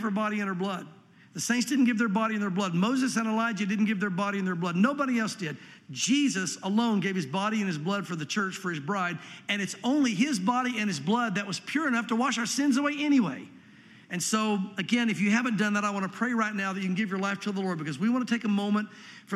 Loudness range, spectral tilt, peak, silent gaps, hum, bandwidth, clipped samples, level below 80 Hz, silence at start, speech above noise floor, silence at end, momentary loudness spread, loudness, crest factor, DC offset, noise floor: 2 LU; -4.5 dB/octave; -10 dBFS; none; none; 14 kHz; under 0.1%; -82 dBFS; 0 s; 25 dB; 0 s; 7 LU; -28 LUFS; 18 dB; under 0.1%; -53 dBFS